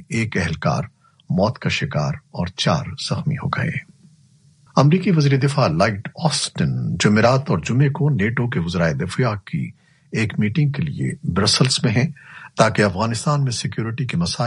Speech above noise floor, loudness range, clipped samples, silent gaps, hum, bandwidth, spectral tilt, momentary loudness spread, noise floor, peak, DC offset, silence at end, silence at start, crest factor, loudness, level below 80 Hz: 34 dB; 4 LU; under 0.1%; none; none; 11.5 kHz; -5.5 dB/octave; 9 LU; -53 dBFS; 0 dBFS; under 0.1%; 0 s; 0 s; 20 dB; -20 LUFS; -48 dBFS